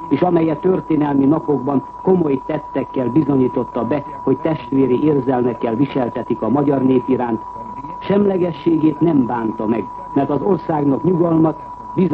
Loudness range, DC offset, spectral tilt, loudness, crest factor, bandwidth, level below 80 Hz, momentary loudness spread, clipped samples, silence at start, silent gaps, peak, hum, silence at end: 1 LU; under 0.1%; -10.5 dB/octave; -17 LUFS; 14 dB; 4.9 kHz; -48 dBFS; 7 LU; under 0.1%; 0 s; none; -2 dBFS; none; 0 s